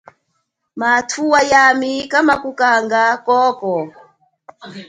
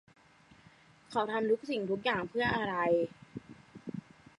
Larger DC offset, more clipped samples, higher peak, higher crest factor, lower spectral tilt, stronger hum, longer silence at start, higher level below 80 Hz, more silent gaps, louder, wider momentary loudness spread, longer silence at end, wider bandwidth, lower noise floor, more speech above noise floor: neither; neither; first, 0 dBFS vs -18 dBFS; about the same, 16 dB vs 18 dB; second, -3 dB/octave vs -6 dB/octave; neither; second, 0.75 s vs 1.1 s; first, -58 dBFS vs -66 dBFS; neither; first, -14 LUFS vs -32 LUFS; second, 12 LU vs 19 LU; second, 0.05 s vs 0.4 s; about the same, 11 kHz vs 11.5 kHz; first, -70 dBFS vs -61 dBFS; first, 55 dB vs 30 dB